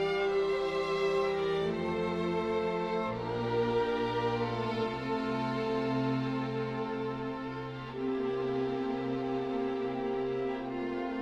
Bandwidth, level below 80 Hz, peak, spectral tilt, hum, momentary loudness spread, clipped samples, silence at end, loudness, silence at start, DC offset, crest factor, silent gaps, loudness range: 9.8 kHz; -58 dBFS; -20 dBFS; -7 dB/octave; none; 5 LU; under 0.1%; 0 s; -33 LUFS; 0 s; under 0.1%; 12 dB; none; 3 LU